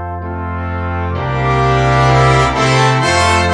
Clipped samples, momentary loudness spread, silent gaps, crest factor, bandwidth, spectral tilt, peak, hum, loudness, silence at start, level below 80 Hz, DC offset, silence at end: under 0.1%; 11 LU; none; 12 dB; 10 kHz; -5 dB/octave; 0 dBFS; none; -13 LUFS; 0 s; -26 dBFS; under 0.1%; 0 s